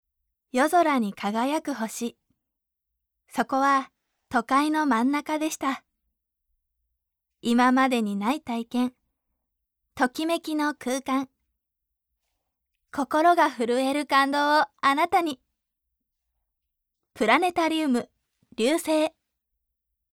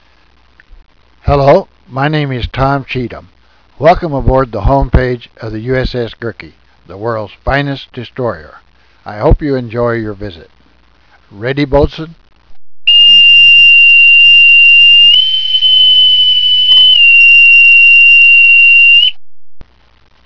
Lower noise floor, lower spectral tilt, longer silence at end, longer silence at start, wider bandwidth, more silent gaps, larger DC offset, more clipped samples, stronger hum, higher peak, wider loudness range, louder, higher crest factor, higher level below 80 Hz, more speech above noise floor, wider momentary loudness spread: first, -84 dBFS vs -48 dBFS; second, -3.5 dB/octave vs -5 dB/octave; first, 1.05 s vs 0 s; first, 0.55 s vs 0 s; first, 17.5 kHz vs 5.4 kHz; neither; neither; second, under 0.1% vs 0.3%; neither; second, -6 dBFS vs 0 dBFS; second, 6 LU vs 16 LU; second, -24 LUFS vs -4 LUFS; first, 20 dB vs 8 dB; second, -70 dBFS vs -24 dBFS; first, 60 dB vs 35 dB; second, 11 LU vs 20 LU